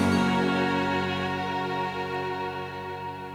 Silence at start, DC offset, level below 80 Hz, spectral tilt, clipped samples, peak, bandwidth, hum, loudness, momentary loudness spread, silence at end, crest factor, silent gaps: 0 s; under 0.1%; -58 dBFS; -6 dB/octave; under 0.1%; -12 dBFS; 16 kHz; none; -28 LUFS; 11 LU; 0 s; 16 dB; none